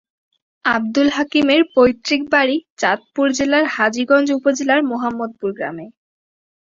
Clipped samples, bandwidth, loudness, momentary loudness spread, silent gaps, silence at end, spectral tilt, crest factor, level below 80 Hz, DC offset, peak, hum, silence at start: under 0.1%; 7.6 kHz; -17 LUFS; 10 LU; 2.70-2.77 s; 0.8 s; -3.5 dB/octave; 16 dB; -56 dBFS; under 0.1%; -2 dBFS; none; 0.65 s